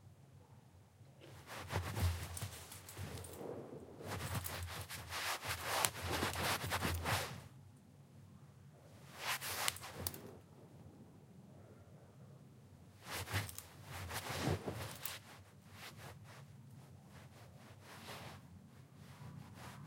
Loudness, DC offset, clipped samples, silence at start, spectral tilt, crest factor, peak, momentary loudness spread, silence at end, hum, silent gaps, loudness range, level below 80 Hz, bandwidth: -43 LUFS; under 0.1%; under 0.1%; 0 s; -3.5 dB/octave; 38 dB; -8 dBFS; 22 LU; 0 s; none; none; 15 LU; -60 dBFS; 16.5 kHz